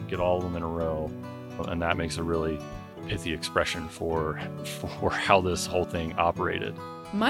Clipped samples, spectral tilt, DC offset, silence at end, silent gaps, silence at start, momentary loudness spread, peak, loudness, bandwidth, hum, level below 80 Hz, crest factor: under 0.1%; -5 dB/octave; under 0.1%; 0 s; none; 0 s; 12 LU; -4 dBFS; -29 LUFS; 17 kHz; none; -48 dBFS; 24 dB